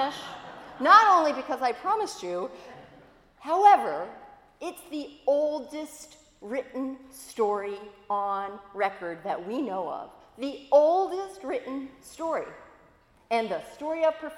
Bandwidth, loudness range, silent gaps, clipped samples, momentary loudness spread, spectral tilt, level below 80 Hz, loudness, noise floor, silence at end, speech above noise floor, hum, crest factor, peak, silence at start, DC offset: 16.5 kHz; 8 LU; none; under 0.1%; 21 LU; -3.5 dB/octave; -68 dBFS; -26 LUFS; -60 dBFS; 0 s; 33 dB; none; 22 dB; -4 dBFS; 0 s; under 0.1%